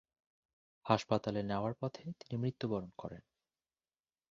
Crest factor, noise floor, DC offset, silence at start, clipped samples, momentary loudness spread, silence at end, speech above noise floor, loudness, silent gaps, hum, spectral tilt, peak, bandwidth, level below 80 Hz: 28 dB; under -90 dBFS; under 0.1%; 0.85 s; under 0.1%; 16 LU; 1.1 s; over 53 dB; -38 LUFS; none; none; -6 dB/octave; -12 dBFS; 7.4 kHz; -68 dBFS